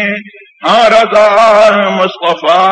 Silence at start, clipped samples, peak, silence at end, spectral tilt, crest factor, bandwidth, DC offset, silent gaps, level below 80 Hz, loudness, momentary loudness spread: 0 s; 0.1%; 0 dBFS; 0 s; -4 dB/octave; 8 dB; 9.6 kHz; under 0.1%; none; -50 dBFS; -8 LUFS; 9 LU